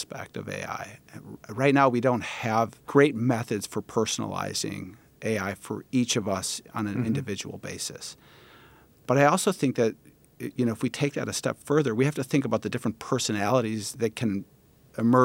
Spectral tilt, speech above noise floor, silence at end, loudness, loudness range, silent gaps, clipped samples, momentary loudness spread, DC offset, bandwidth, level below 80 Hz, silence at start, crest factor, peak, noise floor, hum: -5 dB/octave; 29 dB; 0 s; -27 LUFS; 4 LU; none; under 0.1%; 15 LU; under 0.1%; 17 kHz; -66 dBFS; 0 s; 20 dB; -6 dBFS; -55 dBFS; none